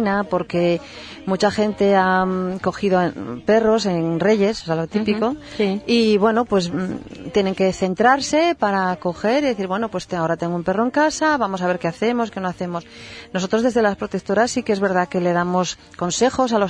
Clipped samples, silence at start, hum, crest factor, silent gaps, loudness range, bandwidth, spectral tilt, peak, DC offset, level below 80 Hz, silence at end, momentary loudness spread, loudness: under 0.1%; 0 s; none; 16 dB; none; 3 LU; 10.5 kHz; -5 dB/octave; -2 dBFS; under 0.1%; -50 dBFS; 0 s; 9 LU; -20 LUFS